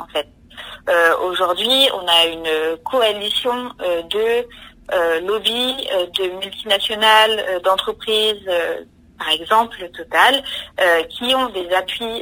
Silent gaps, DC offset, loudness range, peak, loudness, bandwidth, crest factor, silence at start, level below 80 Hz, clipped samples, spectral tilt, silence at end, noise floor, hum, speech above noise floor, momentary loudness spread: none; under 0.1%; 3 LU; 0 dBFS; -17 LUFS; 16 kHz; 18 dB; 0 s; -52 dBFS; under 0.1%; -1.5 dB/octave; 0 s; -38 dBFS; none; 20 dB; 12 LU